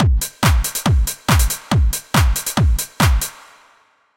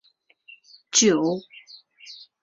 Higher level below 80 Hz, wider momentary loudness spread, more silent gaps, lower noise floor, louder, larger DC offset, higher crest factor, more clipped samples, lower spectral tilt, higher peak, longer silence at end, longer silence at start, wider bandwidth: first, -20 dBFS vs -68 dBFS; second, 2 LU vs 26 LU; neither; about the same, -55 dBFS vs -55 dBFS; first, -18 LUFS vs -21 LUFS; neither; second, 16 dB vs 22 dB; neither; first, -4 dB/octave vs -2.5 dB/octave; about the same, -2 dBFS vs -4 dBFS; first, 0.85 s vs 0.3 s; second, 0 s vs 0.95 s; first, 17 kHz vs 8.2 kHz